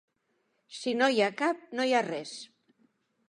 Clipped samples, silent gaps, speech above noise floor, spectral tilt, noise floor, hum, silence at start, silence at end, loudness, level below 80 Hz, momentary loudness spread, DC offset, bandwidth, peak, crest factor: under 0.1%; none; 47 dB; -3.5 dB/octave; -76 dBFS; none; 0.7 s; 0.85 s; -29 LUFS; -86 dBFS; 17 LU; under 0.1%; 11.5 kHz; -12 dBFS; 20 dB